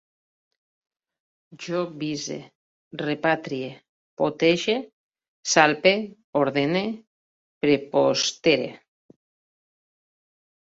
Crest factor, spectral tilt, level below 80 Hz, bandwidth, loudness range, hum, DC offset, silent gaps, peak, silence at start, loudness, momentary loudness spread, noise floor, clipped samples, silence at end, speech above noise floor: 24 dB; -3.5 dB/octave; -68 dBFS; 8 kHz; 7 LU; none; under 0.1%; 2.55-2.91 s, 3.89-4.17 s, 4.93-5.11 s, 5.28-5.43 s, 6.24-6.33 s, 7.07-7.61 s; -2 dBFS; 1.5 s; -23 LUFS; 15 LU; under -90 dBFS; under 0.1%; 1.9 s; over 67 dB